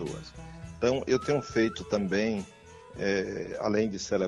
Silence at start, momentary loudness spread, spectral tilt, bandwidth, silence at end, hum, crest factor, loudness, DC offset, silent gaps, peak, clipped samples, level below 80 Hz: 0 s; 17 LU; -5.5 dB/octave; 11.5 kHz; 0 s; none; 18 dB; -29 LUFS; under 0.1%; none; -12 dBFS; under 0.1%; -54 dBFS